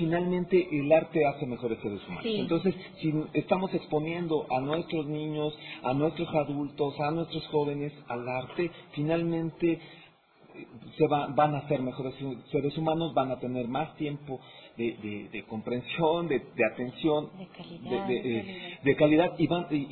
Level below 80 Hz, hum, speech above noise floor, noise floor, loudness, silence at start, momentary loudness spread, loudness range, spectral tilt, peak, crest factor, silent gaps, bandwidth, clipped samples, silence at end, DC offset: -62 dBFS; none; 28 dB; -58 dBFS; -30 LUFS; 0 s; 11 LU; 4 LU; -10.5 dB/octave; -10 dBFS; 20 dB; none; 4.5 kHz; under 0.1%; 0 s; under 0.1%